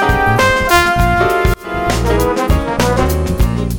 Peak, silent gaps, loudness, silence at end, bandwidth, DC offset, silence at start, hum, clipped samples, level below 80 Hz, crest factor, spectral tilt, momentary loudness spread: 0 dBFS; none; -13 LUFS; 0 s; over 20 kHz; under 0.1%; 0 s; none; under 0.1%; -20 dBFS; 12 dB; -5 dB/octave; 5 LU